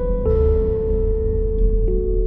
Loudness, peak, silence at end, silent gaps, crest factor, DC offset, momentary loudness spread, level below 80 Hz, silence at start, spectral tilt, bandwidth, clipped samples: -20 LUFS; -6 dBFS; 0 s; none; 10 dB; under 0.1%; 4 LU; -20 dBFS; 0 s; -13 dB/octave; 2.1 kHz; under 0.1%